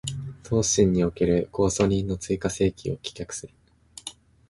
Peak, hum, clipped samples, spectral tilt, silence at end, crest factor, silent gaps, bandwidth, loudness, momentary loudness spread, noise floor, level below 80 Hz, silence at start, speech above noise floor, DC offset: -6 dBFS; none; under 0.1%; -5 dB/octave; 0.4 s; 20 dB; none; 11.5 kHz; -25 LUFS; 17 LU; -44 dBFS; -44 dBFS; 0.05 s; 21 dB; under 0.1%